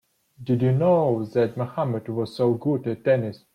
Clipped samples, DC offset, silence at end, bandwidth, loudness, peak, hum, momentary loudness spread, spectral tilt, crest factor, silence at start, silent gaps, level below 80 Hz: under 0.1%; under 0.1%; 0.2 s; 9.8 kHz; -23 LUFS; -10 dBFS; none; 8 LU; -9.5 dB/octave; 14 dB; 0.4 s; none; -62 dBFS